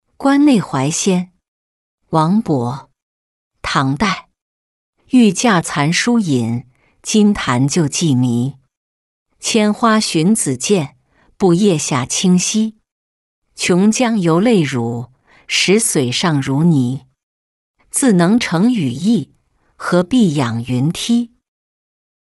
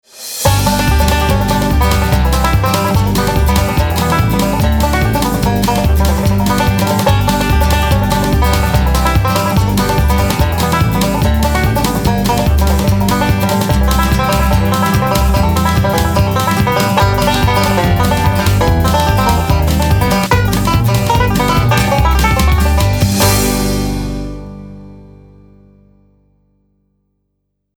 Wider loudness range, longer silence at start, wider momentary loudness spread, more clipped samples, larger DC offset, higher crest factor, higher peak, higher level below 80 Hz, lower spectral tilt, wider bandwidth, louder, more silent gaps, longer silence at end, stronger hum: first, 4 LU vs 1 LU; about the same, 0.2 s vs 0.15 s; first, 10 LU vs 2 LU; neither; neither; about the same, 14 dB vs 12 dB; about the same, -2 dBFS vs 0 dBFS; second, -50 dBFS vs -18 dBFS; about the same, -5 dB/octave vs -5.5 dB/octave; second, 12 kHz vs 20 kHz; second, -15 LUFS vs -12 LUFS; first, 1.48-1.98 s, 3.02-3.51 s, 4.42-4.93 s, 8.77-9.26 s, 12.92-13.42 s, 17.23-17.74 s vs none; second, 1.1 s vs 2.75 s; second, none vs 50 Hz at -35 dBFS